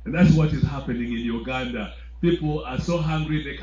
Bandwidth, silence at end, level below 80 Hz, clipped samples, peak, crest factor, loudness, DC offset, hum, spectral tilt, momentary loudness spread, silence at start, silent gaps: 7.6 kHz; 0 s; -36 dBFS; under 0.1%; -4 dBFS; 18 dB; -24 LUFS; under 0.1%; none; -7.5 dB/octave; 10 LU; 0 s; none